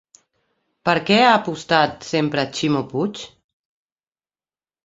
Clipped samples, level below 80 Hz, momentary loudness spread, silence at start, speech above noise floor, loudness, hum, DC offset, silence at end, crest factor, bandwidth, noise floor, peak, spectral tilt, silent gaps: under 0.1%; -60 dBFS; 12 LU; 0.85 s; over 71 dB; -19 LUFS; none; under 0.1%; 1.6 s; 20 dB; 8 kHz; under -90 dBFS; -2 dBFS; -5 dB/octave; none